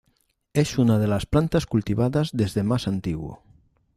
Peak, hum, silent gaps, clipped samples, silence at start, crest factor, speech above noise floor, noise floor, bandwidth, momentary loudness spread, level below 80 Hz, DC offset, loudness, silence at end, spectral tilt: -6 dBFS; none; none; under 0.1%; 0.55 s; 18 dB; 46 dB; -69 dBFS; 15 kHz; 8 LU; -44 dBFS; under 0.1%; -23 LUFS; 0.6 s; -7 dB/octave